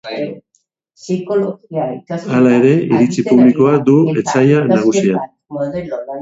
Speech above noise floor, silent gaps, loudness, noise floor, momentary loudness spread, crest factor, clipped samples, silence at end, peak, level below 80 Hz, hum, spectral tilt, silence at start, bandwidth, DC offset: 50 dB; none; -14 LUFS; -63 dBFS; 13 LU; 14 dB; under 0.1%; 0 s; 0 dBFS; -56 dBFS; none; -7 dB/octave; 0.05 s; 8 kHz; under 0.1%